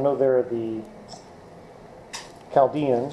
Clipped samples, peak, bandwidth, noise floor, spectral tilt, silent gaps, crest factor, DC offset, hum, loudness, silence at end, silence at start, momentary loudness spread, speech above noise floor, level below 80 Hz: under 0.1%; -6 dBFS; 12 kHz; -45 dBFS; -6.5 dB/octave; none; 18 dB; under 0.1%; none; -23 LUFS; 0 s; 0 s; 25 LU; 23 dB; -60 dBFS